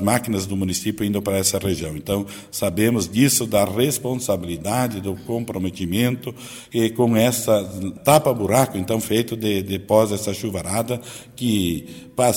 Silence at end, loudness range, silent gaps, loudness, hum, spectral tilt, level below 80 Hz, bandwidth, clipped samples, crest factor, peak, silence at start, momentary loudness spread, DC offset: 0 s; 3 LU; none; -21 LUFS; none; -4.5 dB/octave; -50 dBFS; 17 kHz; under 0.1%; 20 dB; -2 dBFS; 0 s; 10 LU; under 0.1%